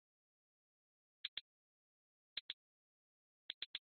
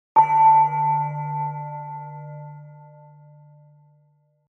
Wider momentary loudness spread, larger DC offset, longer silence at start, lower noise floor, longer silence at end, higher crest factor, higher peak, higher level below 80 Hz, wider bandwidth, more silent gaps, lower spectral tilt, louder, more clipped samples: second, 5 LU vs 24 LU; neither; first, 1.25 s vs 0.15 s; first, under -90 dBFS vs -62 dBFS; second, 0.2 s vs 1.75 s; first, 28 dB vs 18 dB; second, -30 dBFS vs -4 dBFS; second, under -90 dBFS vs -78 dBFS; first, 4.5 kHz vs 3.1 kHz; first, 1.28-3.74 s vs none; second, 4.5 dB/octave vs -8.5 dB/octave; second, -50 LUFS vs -19 LUFS; neither